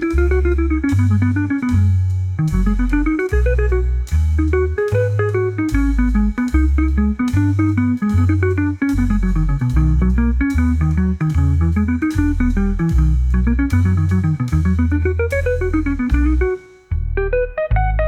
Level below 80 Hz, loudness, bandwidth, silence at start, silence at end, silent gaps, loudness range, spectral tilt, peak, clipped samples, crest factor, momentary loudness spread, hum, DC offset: -20 dBFS; -17 LUFS; 9.8 kHz; 0 s; 0 s; none; 1 LU; -9 dB/octave; -4 dBFS; under 0.1%; 12 dB; 3 LU; none; under 0.1%